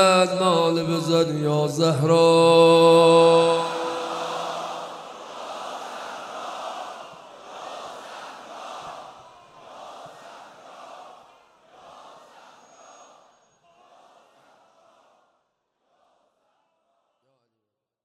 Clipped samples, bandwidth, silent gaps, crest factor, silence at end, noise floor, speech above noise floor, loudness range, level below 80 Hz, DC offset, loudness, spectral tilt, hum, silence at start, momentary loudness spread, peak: under 0.1%; 13 kHz; none; 20 dB; 7 s; -82 dBFS; 65 dB; 24 LU; -70 dBFS; under 0.1%; -19 LUFS; -5 dB/octave; none; 0 s; 27 LU; -4 dBFS